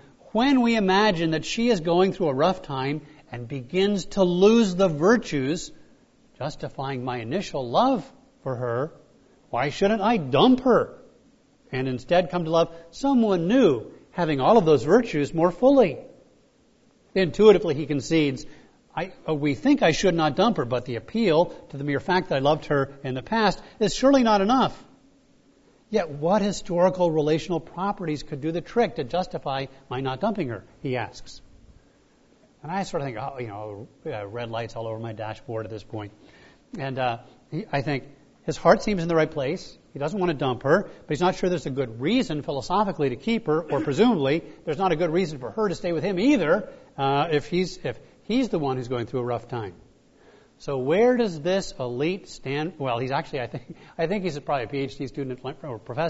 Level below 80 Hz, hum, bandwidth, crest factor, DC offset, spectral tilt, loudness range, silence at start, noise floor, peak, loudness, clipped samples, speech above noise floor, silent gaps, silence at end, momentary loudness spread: -50 dBFS; none; 8 kHz; 20 dB; under 0.1%; -6 dB/octave; 10 LU; 0.35 s; -60 dBFS; -4 dBFS; -24 LUFS; under 0.1%; 36 dB; none; 0 s; 15 LU